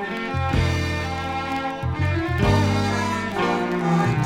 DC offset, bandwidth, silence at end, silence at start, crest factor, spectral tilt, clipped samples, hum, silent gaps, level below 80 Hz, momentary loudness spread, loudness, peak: under 0.1%; 15 kHz; 0 s; 0 s; 16 dB; -6 dB/octave; under 0.1%; none; none; -38 dBFS; 6 LU; -23 LUFS; -6 dBFS